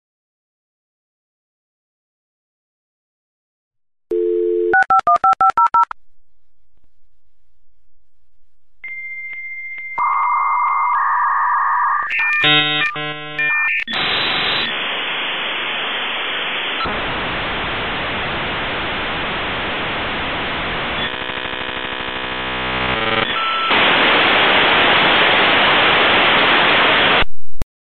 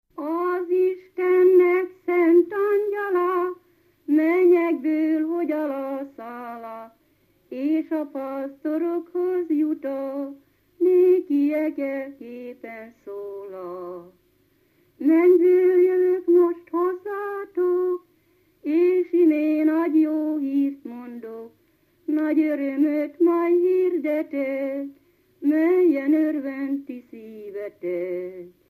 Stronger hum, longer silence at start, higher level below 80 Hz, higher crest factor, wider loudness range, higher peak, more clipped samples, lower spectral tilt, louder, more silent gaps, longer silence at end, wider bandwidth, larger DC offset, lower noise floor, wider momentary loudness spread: neither; first, 4.1 s vs 0.15 s; first, -42 dBFS vs -76 dBFS; about the same, 16 dB vs 14 dB; first, 11 LU vs 7 LU; first, -2 dBFS vs -8 dBFS; neither; second, -5 dB/octave vs -7.5 dB/octave; first, -15 LUFS vs -22 LUFS; neither; first, 0.35 s vs 0.2 s; about the same, 14 kHz vs 14 kHz; neither; about the same, -64 dBFS vs -63 dBFS; second, 11 LU vs 19 LU